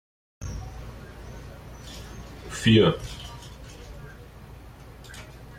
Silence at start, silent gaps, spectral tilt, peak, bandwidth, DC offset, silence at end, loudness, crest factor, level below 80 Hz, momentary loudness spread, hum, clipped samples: 0.4 s; none; -6 dB/octave; -8 dBFS; 16 kHz; under 0.1%; 0 s; -24 LUFS; 22 dB; -44 dBFS; 26 LU; none; under 0.1%